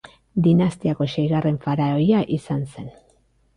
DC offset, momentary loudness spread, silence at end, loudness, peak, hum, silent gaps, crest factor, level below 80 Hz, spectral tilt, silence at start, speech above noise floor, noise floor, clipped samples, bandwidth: under 0.1%; 12 LU; 0.65 s; -21 LUFS; -6 dBFS; none; none; 14 dB; -52 dBFS; -8.5 dB/octave; 0.35 s; 40 dB; -60 dBFS; under 0.1%; 10.5 kHz